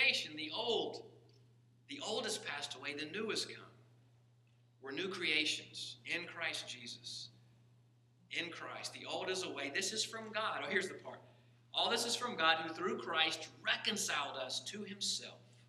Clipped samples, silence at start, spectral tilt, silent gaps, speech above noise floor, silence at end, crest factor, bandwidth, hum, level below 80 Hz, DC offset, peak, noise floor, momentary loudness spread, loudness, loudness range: under 0.1%; 0 s; -1.5 dB/octave; none; 29 dB; 0.05 s; 26 dB; 13.5 kHz; none; -90 dBFS; under 0.1%; -16 dBFS; -69 dBFS; 13 LU; -38 LUFS; 7 LU